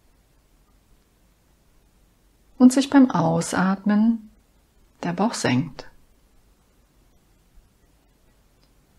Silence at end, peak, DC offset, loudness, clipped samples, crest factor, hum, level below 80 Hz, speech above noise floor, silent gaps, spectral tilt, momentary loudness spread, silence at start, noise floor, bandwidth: 3.1 s; -4 dBFS; under 0.1%; -20 LUFS; under 0.1%; 22 dB; none; -58 dBFS; 41 dB; none; -5.5 dB/octave; 14 LU; 2.6 s; -60 dBFS; 12.5 kHz